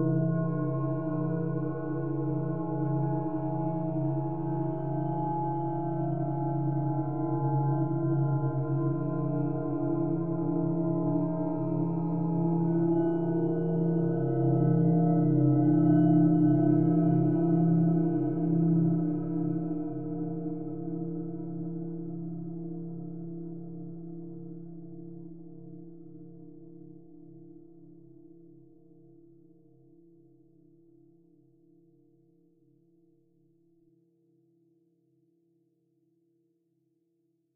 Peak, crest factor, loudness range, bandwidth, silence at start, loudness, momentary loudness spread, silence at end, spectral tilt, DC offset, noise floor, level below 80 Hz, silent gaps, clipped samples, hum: -14 dBFS; 16 dB; 19 LU; 2.1 kHz; 0 s; -29 LUFS; 18 LU; 0 s; -13 dB/octave; 0.6%; -75 dBFS; -62 dBFS; none; under 0.1%; none